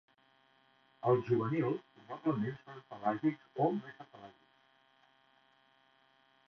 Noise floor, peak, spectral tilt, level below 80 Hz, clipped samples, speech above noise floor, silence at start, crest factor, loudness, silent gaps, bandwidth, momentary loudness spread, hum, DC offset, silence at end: -70 dBFS; -16 dBFS; -7.5 dB/octave; -78 dBFS; under 0.1%; 35 dB; 1.05 s; 22 dB; -35 LUFS; none; 6.2 kHz; 21 LU; none; under 0.1%; 2.15 s